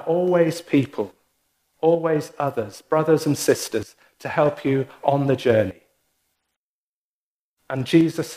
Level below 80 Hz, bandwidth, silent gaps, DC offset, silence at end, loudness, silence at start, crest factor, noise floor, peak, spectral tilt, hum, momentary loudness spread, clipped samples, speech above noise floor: -64 dBFS; 15.5 kHz; 6.56-7.57 s; under 0.1%; 0 s; -22 LUFS; 0 s; 18 dB; under -90 dBFS; -4 dBFS; -6 dB/octave; none; 11 LU; under 0.1%; over 69 dB